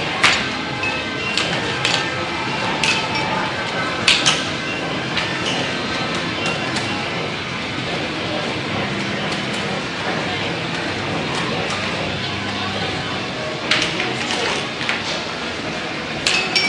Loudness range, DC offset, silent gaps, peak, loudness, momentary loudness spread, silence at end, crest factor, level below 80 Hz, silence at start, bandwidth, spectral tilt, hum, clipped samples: 4 LU; under 0.1%; none; -2 dBFS; -20 LUFS; 6 LU; 0 s; 20 dB; -48 dBFS; 0 s; 11.5 kHz; -3 dB/octave; none; under 0.1%